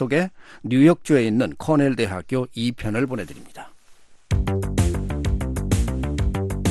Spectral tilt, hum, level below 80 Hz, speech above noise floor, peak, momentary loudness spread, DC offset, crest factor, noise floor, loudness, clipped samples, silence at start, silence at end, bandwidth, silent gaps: -6.5 dB/octave; none; -30 dBFS; 27 dB; -4 dBFS; 13 LU; under 0.1%; 16 dB; -48 dBFS; -22 LUFS; under 0.1%; 0 s; 0 s; 12.5 kHz; none